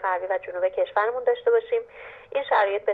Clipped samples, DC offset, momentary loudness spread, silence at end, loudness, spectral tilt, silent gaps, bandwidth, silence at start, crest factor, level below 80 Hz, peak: under 0.1%; under 0.1%; 9 LU; 0 s; -24 LUFS; -5 dB/octave; none; 4.7 kHz; 0 s; 14 dB; -68 dBFS; -10 dBFS